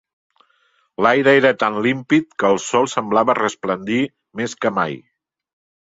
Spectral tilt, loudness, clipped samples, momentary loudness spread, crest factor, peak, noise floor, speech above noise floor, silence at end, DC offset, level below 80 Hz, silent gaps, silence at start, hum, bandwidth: -4.5 dB/octave; -18 LUFS; under 0.1%; 12 LU; 18 dB; -2 dBFS; -62 dBFS; 44 dB; 0.85 s; under 0.1%; -62 dBFS; none; 1 s; none; 8 kHz